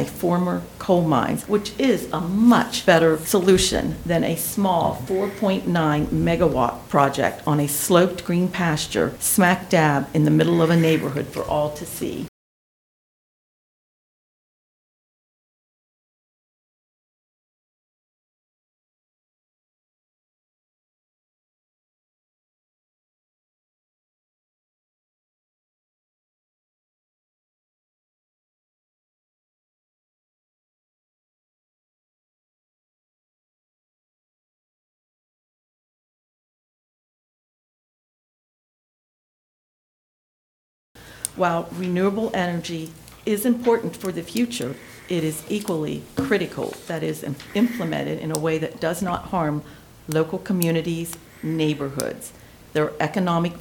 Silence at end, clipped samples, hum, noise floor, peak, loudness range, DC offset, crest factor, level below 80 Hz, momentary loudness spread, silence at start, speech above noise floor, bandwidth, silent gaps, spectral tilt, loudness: 0 s; under 0.1%; none; under -90 dBFS; -2 dBFS; 8 LU; under 0.1%; 24 dB; -50 dBFS; 11 LU; 0 s; over 69 dB; 19 kHz; 12.28-40.95 s; -5 dB/octave; -22 LUFS